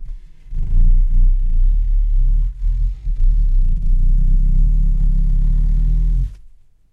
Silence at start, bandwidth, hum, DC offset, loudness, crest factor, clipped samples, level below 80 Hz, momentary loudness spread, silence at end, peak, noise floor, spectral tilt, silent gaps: 0 s; 0.5 kHz; none; under 0.1%; -21 LUFS; 8 dB; under 0.1%; -14 dBFS; 6 LU; 0.45 s; -4 dBFS; -43 dBFS; -9.5 dB/octave; none